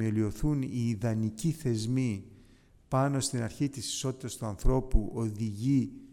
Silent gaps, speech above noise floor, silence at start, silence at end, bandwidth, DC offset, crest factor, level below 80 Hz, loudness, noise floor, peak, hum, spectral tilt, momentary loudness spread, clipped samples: none; 29 dB; 0 s; 0 s; 17 kHz; under 0.1%; 18 dB; -38 dBFS; -31 LUFS; -59 dBFS; -12 dBFS; none; -6 dB/octave; 5 LU; under 0.1%